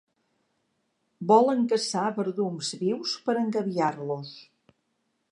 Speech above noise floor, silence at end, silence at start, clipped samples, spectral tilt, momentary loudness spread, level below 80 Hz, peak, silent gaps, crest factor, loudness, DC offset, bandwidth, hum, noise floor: 50 dB; 0.9 s; 1.2 s; under 0.1%; -5 dB/octave; 13 LU; -82 dBFS; -8 dBFS; none; 20 dB; -26 LUFS; under 0.1%; 11 kHz; none; -76 dBFS